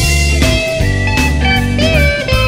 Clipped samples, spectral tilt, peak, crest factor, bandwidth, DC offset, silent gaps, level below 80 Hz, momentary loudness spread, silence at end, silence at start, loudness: under 0.1%; -4.5 dB/octave; 0 dBFS; 12 dB; 16.5 kHz; under 0.1%; none; -16 dBFS; 3 LU; 0 s; 0 s; -12 LUFS